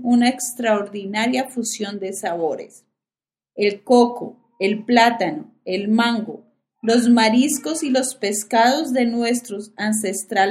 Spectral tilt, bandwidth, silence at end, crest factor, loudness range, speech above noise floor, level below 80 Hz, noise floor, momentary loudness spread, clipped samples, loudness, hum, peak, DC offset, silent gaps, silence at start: -3.5 dB/octave; 15.5 kHz; 0 s; 20 dB; 4 LU; over 71 dB; -66 dBFS; under -90 dBFS; 12 LU; under 0.1%; -19 LUFS; none; 0 dBFS; under 0.1%; none; 0 s